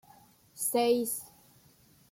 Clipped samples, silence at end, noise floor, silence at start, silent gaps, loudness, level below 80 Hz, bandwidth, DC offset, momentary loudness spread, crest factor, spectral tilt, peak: under 0.1%; 0.85 s; -62 dBFS; 0.55 s; none; -30 LUFS; -76 dBFS; 16.5 kHz; under 0.1%; 13 LU; 18 dB; -2.5 dB/octave; -16 dBFS